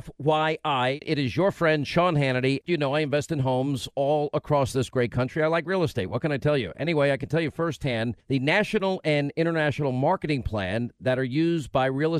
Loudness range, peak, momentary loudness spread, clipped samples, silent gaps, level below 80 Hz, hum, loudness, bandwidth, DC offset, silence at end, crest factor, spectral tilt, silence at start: 1 LU; -8 dBFS; 5 LU; under 0.1%; none; -52 dBFS; none; -25 LUFS; 13.5 kHz; under 0.1%; 0 s; 16 dB; -6.5 dB/octave; 0.05 s